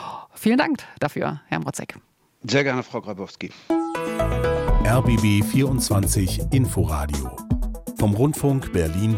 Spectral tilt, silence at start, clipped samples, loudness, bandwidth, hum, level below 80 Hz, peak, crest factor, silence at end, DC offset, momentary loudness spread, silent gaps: -6 dB/octave; 0 s; under 0.1%; -22 LUFS; 17 kHz; none; -32 dBFS; -4 dBFS; 16 dB; 0 s; under 0.1%; 12 LU; none